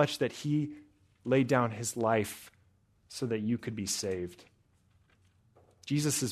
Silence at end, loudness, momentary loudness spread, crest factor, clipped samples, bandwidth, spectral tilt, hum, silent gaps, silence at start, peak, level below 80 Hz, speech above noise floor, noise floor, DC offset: 0 s; -32 LUFS; 15 LU; 22 dB; under 0.1%; 13.5 kHz; -5 dB/octave; none; none; 0 s; -12 dBFS; -70 dBFS; 37 dB; -68 dBFS; under 0.1%